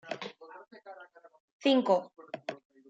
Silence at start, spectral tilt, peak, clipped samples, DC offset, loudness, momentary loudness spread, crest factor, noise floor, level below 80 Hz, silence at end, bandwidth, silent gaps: 0.05 s; -5 dB/octave; -12 dBFS; under 0.1%; under 0.1%; -30 LUFS; 24 LU; 22 dB; -53 dBFS; -88 dBFS; 0.35 s; 8 kHz; 1.40-1.60 s